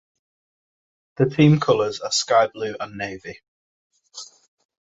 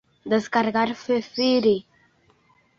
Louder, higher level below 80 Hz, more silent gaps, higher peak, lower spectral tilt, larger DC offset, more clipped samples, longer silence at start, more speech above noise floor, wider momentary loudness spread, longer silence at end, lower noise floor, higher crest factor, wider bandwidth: first, -20 LUFS vs -23 LUFS; about the same, -60 dBFS vs -64 dBFS; first, 3.48-3.90 s vs none; first, -2 dBFS vs -6 dBFS; about the same, -5.5 dB/octave vs -5.5 dB/octave; neither; neither; first, 1.2 s vs 0.25 s; second, 23 dB vs 39 dB; first, 23 LU vs 6 LU; second, 0.7 s vs 0.95 s; second, -43 dBFS vs -61 dBFS; about the same, 20 dB vs 18 dB; about the same, 8 kHz vs 7.4 kHz